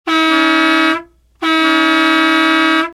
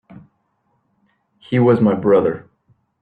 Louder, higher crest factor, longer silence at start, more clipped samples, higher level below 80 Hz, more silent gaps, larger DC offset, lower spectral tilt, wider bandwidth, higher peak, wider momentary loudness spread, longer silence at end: first, -11 LUFS vs -16 LUFS; about the same, 12 dB vs 16 dB; second, 0.05 s vs 1.5 s; neither; about the same, -54 dBFS vs -58 dBFS; neither; neither; second, -1.5 dB/octave vs -10.5 dB/octave; first, 13.5 kHz vs 4.7 kHz; first, 0 dBFS vs -4 dBFS; second, 5 LU vs 9 LU; second, 0.05 s vs 0.65 s